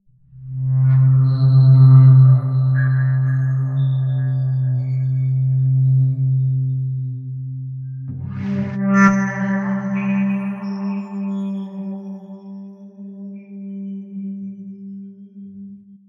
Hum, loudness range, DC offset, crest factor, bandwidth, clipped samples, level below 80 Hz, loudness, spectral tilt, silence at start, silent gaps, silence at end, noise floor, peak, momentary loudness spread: none; 19 LU; under 0.1%; 16 dB; 6.4 kHz; under 0.1%; -52 dBFS; -17 LUFS; -9.5 dB/octave; 0.35 s; none; 0.3 s; -39 dBFS; -2 dBFS; 22 LU